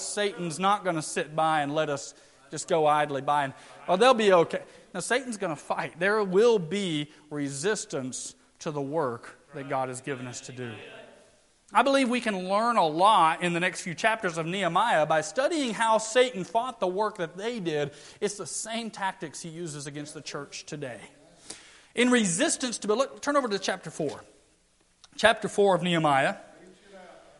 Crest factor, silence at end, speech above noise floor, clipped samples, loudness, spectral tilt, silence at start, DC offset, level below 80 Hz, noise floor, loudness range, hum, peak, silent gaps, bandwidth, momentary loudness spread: 24 dB; 0.2 s; 38 dB; under 0.1%; -27 LUFS; -4 dB/octave; 0 s; under 0.1%; -68 dBFS; -65 dBFS; 9 LU; none; -4 dBFS; none; 11.5 kHz; 16 LU